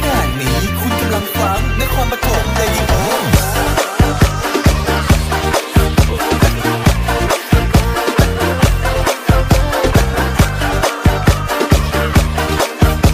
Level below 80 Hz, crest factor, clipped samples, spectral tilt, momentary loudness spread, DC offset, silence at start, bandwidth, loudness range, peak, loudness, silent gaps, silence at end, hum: -18 dBFS; 12 dB; under 0.1%; -5 dB/octave; 3 LU; under 0.1%; 0 s; 16 kHz; 1 LU; -2 dBFS; -14 LUFS; none; 0 s; none